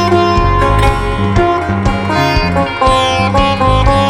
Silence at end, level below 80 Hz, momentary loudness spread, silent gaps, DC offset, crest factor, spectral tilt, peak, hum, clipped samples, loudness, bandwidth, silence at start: 0 s; -18 dBFS; 3 LU; none; under 0.1%; 10 dB; -6 dB/octave; 0 dBFS; none; under 0.1%; -12 LUFS; 15 kHz; 0 s